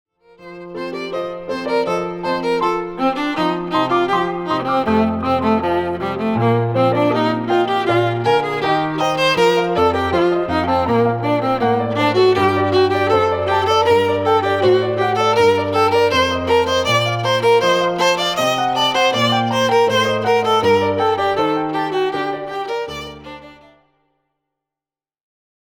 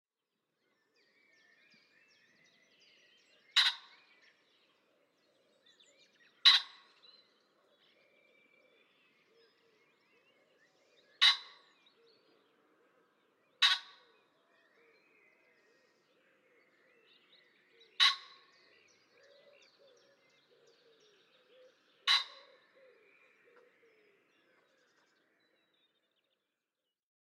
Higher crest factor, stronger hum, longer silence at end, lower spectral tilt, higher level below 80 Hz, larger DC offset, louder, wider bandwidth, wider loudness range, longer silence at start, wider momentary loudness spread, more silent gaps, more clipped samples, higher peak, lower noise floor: second, 14 dB vs 30 dB; neither; second, 2.15 s vs 4.95 s; first, -5 dB/octave vs 4 dB/octave; first, -48 dBFS vs under -90 dBFS; neither; first, -17 LUFS vs -28 LUFS; first, 19.5 kHz vs 11.5 kHz; about the same, 6 LU vs 5 LU; second, 0.4 s vs 3.55 s; second, 8 LU vs 23 LU; neither; neither; first, -4 dBFS vs -10 dBFS; about the same, under -90 dBFS vs under -90 dBFS